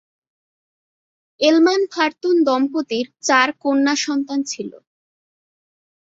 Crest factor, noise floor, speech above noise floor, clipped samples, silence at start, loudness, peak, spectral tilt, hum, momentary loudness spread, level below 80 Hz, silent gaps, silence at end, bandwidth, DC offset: 18 dB; under -90 dBFS; over 72 dB; under 0.1%; 1.4 s; -18 LUFS; -2 dBFS; -2 dB/octave; none; 9 LU; -70 dBFS; none; 1.3 s; 7.8 kHz; under 0.1%